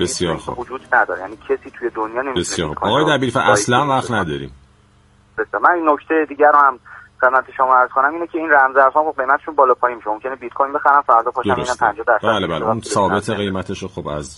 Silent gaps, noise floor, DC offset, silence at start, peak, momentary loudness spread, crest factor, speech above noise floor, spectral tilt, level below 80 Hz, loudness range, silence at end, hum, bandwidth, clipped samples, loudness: none; -52 dBFS; under 0.1%; 0 s; 0 dBFS; 13 LU; 16 dB; 35 dB; -4 dB/octave; -48 dBFS; 3 LU; 0.05 s; none; 11.5 kHz; under 0.1%; -17 LUFS